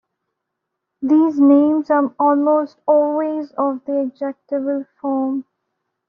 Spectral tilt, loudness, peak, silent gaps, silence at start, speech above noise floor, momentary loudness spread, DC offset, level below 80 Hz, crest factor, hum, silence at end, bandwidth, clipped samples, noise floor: -6 dB/octave; -18 LUFS; -4 dBFS; none; 1 s; 62 dB; 11 LU; under 0.1%; -70 dBFS; 14 dB; none; 0.65 s; 5.2 kHz; under 0.1%; -78 dBFS